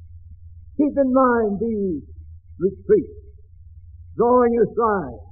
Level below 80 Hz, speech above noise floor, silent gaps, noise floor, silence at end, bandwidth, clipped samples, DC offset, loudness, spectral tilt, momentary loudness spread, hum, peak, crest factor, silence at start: -46 dBFS; 25 dB; none; -44 dBFS; 0.05 s; 2.6 kHz; under 0.1%; 0.2%; -20 LUFS; -4 dB/octave; 13 LU; none; -4 dBFS; 16 dB; 0 s